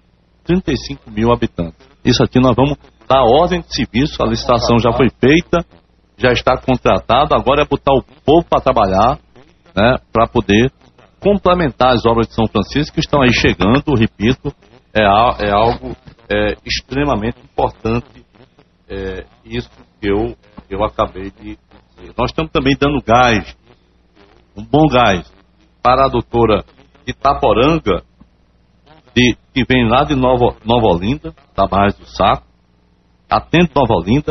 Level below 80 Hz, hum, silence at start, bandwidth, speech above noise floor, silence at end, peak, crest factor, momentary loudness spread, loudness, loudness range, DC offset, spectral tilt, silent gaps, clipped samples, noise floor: -32 dBFS; none; 0.5 s; 6.2 kHz; 40 dB; 0 s; 0 dBFS; 14 dB; 14 LU; -14 LUFS; 7 LU; under 0.1%; -4.5 dB/octave; none; under 0.1%; -54 dBFS